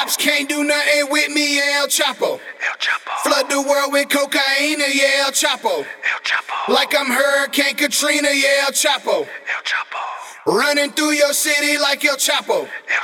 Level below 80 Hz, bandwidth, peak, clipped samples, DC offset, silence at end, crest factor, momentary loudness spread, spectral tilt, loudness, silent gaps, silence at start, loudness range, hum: -74 dBFS; 19 kHz; -2 dBFS; under 0.1%; under 0.1%; 0 s; 16 dB; 7 LU; 0 dB/octave; -16 LUFS; none; 0 s; 1 LU; none